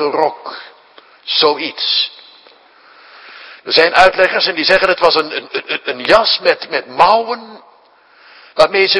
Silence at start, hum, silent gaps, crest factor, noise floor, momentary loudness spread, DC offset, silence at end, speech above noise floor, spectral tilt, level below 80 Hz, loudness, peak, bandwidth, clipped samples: 0 s; none; none; 16 dB; -48 dBFS; 18 LU; under 0.1%; 0 s; 35 dB; -3 dB/octave; -50 dBFS; -13 LUFS; 0 dBFS; 11 kHz; 0.3%